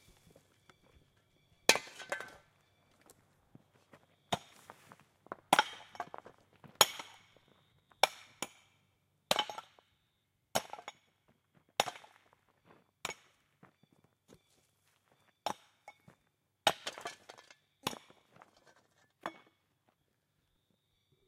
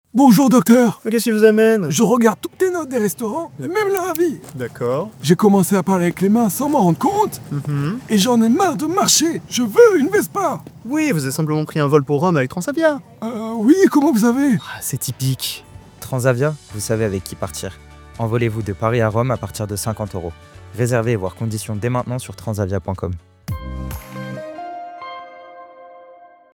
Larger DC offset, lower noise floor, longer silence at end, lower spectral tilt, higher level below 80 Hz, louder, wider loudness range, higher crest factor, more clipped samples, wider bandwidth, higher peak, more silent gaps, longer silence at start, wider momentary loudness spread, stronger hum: neither; first, -80 dBFS vs -44 dBFS; first, 1.95 s vs 0.4 s; second, -1 dB/octave vs -5.5 dB/octave; second, -78 dBFS vs -46 dBFS; second, -36 LUFS vs -17 LUFS; first, 14 LU vs 9 LU; first, 38 dB vs 16 dB; neither; second, 16 kHz vs over 20 kHz; second, -4 dBFS vs 0 dBFS; neither; first, 1.7 s vs 0.15 s; first, 24 LU vs 17 LU; neither